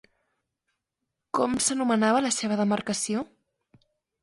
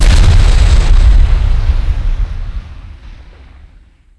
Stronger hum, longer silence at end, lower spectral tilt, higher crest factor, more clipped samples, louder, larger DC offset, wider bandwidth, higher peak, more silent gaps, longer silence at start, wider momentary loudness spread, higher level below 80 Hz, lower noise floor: neither; about the same, 1 s vs 0.95 s; second, -3.5 dB/octave vs -5.5 dB/octave; first, 18 dB vs 8 dB; neither; second, -25 LUFS vs -12 LUFS; neither; about the same, 11.5 kHz vs 11 kHz; second, -10 dBFS vs 0 dBFS; neither; first, 1.35 s vs 0 s; second, 9 LU vs 20 LU; second, -64 dBFS vs -10 dBFS; first, -84 dBFS vs -42 dBFS